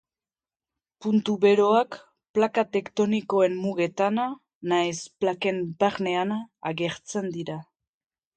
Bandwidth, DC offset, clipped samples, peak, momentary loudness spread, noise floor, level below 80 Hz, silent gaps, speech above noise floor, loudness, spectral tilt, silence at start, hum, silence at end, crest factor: 9.2 kHz; under 0.1%; under 0.1%; -8 dBFS; 12 LU; under -90 dBFS; -70 dBFS; 2.29-2.34 s, 4.55-4.61 s; over 65 dB; -25 LUFS; -5.5 dB/octave; 1 s; none; 0.75 s; 18 dB